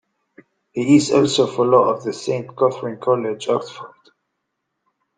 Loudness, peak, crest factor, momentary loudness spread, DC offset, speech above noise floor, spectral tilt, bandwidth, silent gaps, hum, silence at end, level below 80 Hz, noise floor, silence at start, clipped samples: -18 LUFS; -2 dBFS; 18 dB; 10 LU; under 0.1%; 58 dB; -5.5 dB/octave; 9.6 kHz; none; none; 1.3 s; -62 dBFS; -76 dBFS; 0.75 s; under 0.1%